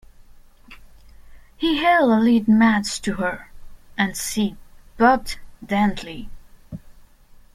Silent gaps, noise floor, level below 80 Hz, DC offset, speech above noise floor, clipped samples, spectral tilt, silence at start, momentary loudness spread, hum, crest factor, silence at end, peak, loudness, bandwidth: none; -48 dBFS; -44 dBFS; under 0.1%; 29 dB; under 0.1%; -4.5 dB/octave; 0.7 s; 21 LU; none; 20 dB; 0.65 s; -2 dBFS; -20 LUFS; 15.5 kHz